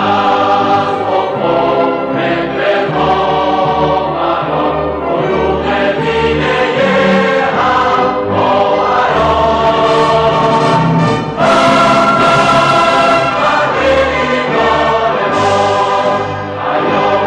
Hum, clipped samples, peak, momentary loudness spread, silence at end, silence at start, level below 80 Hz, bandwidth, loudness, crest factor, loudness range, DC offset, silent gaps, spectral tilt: none; under 0.1%; -2 dBFS; 5 LU; 0 s; 0 s; -36 dBFS; 11.5 kHz; -11 LUFS; 8 dB; 4 LU; under 0.1%; none; -5.5 dB/octave